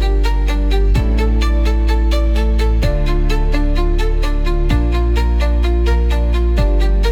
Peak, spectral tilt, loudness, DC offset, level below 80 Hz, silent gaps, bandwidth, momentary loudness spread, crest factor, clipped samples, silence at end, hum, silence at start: -2 dBFS; -7 dB/octave; -17 LUFS; under 0.1%; -14 dBFS; none; 8 kHz; 2 LU; 10 dB; under 0.1%; 0 s; none; 0 s